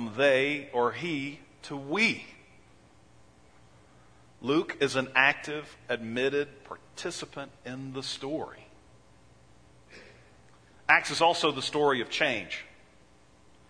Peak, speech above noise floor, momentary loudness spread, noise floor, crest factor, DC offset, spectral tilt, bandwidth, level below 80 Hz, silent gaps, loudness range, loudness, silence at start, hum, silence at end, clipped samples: -6 dBFS; 31 dB; 18 LU; -60 dBFS; 26 dB; under 0.1%; -3.5 dB/octave; 10.5 kHz; -66 dBFS; none; 12 LU; -28 LUFS; 0 s; none; 1 s; under 0.1%